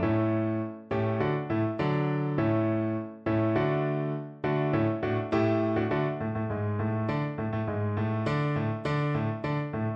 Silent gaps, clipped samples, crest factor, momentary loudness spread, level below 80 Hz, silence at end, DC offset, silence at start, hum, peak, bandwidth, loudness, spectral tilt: none; under 0.1%; 14 dB; 5 LU; -56 dBFS; 0 s; under 0.1%; 0 s; none; -14 dBFS; 7 kHz; -29 LUFS; -9.5 dB/octave